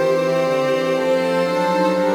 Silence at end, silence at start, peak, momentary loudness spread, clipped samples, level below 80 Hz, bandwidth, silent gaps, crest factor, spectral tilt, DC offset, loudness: 0 s; 0 s; -6 dBFS; 1 LU; under 0.1%; -62 dBFS; 16.5 kHz; none; 12 dB; -5.5 dB/octave; under 0.1%; -18 LUFS